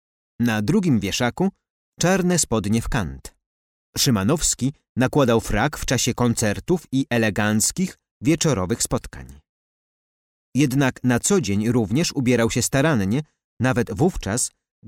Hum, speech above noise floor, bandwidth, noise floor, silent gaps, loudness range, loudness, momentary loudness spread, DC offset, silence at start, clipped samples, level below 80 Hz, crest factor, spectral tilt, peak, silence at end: none; over 69 dB; 17 kHz; under -90 dBFS; 1.70-1.92 s, 3.46-3.93 s, 4.89-4.95 s, 8.11-8.20 s, 9.49-10.52 s, 13.44-13.57 s; 3 LU; -21 LUFS; 7 LU; under 0.1%; 0.4 s; under 0.1%; -40 dBFS; 14 dB; -4.5 dB/octave; -8 dBFS; 0.4 s